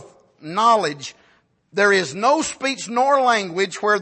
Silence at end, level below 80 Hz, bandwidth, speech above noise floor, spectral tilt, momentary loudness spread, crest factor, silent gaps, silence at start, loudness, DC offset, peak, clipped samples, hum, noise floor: 0 s; -66 dBFS; 8.8 kHz; 40 dB; -3 dB/octave; 11 LU; 16 dB; none; 0 s; -19 LUFS; under 0.1%; -4 dBFS; under 0.1%; none; -59 dBFS